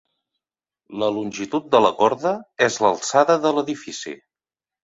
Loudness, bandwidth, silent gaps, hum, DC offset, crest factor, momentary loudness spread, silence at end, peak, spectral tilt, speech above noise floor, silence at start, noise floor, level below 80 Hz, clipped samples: -20 LUFS; 8.2 kHz; none; none; under 0.1%; 20 dB; 15 LU; 0.7 s; -2 dBFS; -3.5 dB/octave; over 70 dB; 0.9 s; under -90 dBFS; -66 dBFS; under 0.1%